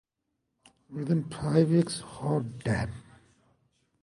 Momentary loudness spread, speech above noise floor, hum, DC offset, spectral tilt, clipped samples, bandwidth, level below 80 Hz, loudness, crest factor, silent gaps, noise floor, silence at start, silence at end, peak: 14 LU; 54 dB; none; under 0.1%; -7 dB/octave; under 0.1%; 11.5 kHz; -54 dBFS; -29 LUFS; 20 dB; none; -81 dBFS; 0.9 s; 1 s; -10 dBFS